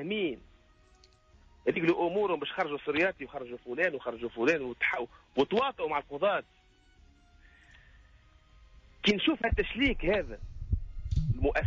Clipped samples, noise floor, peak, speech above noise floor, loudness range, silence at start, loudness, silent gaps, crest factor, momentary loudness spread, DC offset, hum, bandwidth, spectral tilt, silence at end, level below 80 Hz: under 0.1%; -62 dBFS; -14 dBFS; 31 dB; 4 LU; 0 s; -31 LUFS; none; 18 dB; 9 LU; under 0.1%; none; 7.6 kHz; -6.5 dB/octave; 0 s; -44 dBFS